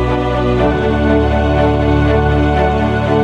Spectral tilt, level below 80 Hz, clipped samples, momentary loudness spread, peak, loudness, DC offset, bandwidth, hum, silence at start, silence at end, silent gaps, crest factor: -8 dB/octave; -20 dBFS; under 0.1%; 2 LU; -2 dBFS; -13 LUFS; under 0.1%; 8 kHz; none; 0 s; 0 s; none; 12 dB